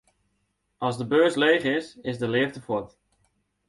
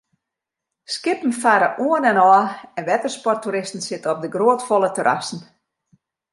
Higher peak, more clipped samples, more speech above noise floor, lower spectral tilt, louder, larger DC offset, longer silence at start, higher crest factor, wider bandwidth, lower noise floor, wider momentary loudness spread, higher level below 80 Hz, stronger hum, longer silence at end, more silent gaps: second, -6 dBFS vs -2 dBFS; neither; second, 50 dB vs 65 dB; first, -5.5 dB/octave vs -4 dB/octave; second, -25 LUFS vs -19 LUFS; neither; about the same, 0.8 s vs 0.9 s; about the same, 20 dB vs 18 dB; about the same, 11.5 kHz vs 11.5 kHz; second, -74 dBFS vs -84 dBFS; about the same, 11 LU vs 12 LU; first, -64 dBFS vs -74 dBFS; neither; about the same, 0.8 s vs 0.9 s; neither